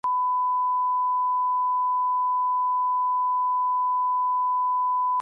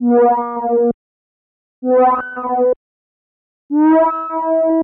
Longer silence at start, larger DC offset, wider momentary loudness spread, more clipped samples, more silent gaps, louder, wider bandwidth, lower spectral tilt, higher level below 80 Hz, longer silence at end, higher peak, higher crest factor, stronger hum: about the same, 0.05 s vs 0 s; neither; second, 0 LU vs 9 LU; neither; second, none vs 0.94-1.82 s, 2.76-3.69 s; second, -24 LUFS vs -15 LUFS; second, 1.7 kHz vs 3.4 kHz; second, -3 dB/octave vs -6 dB/octave; second, -86 dBFS vs -58 dBFS; about the same, 0 s vs 0 s; second, -20 dBFS vs -4 dBFS; second, 4 dB vs 10 dB; first, 50 Hz at -105 dBFS vs none